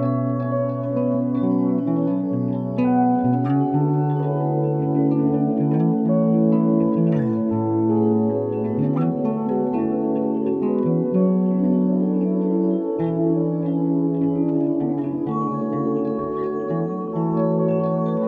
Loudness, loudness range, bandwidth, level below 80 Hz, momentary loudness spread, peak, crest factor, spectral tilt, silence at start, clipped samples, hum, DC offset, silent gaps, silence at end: -21 LUFS; 3 LU; 3.8 kHz; -60 dBFS; 5 LU; -6 dBFS; 14 dB; -12.5 dB/octave; 0 s; under 0.1%; none; under 0.1%; none; 0 s